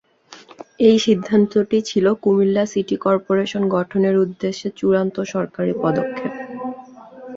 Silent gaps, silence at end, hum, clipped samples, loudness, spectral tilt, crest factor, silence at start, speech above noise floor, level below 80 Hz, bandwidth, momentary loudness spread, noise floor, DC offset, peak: none; 0 s; none; under 0.1%; -19 LUFS; -6.5 dB/octave; 16 dB; 0.3 s; 27 dB; -60 dBFS; 7.8 kHz; 12 LU; -45 dBFS; under 0.1%; -2 dBFS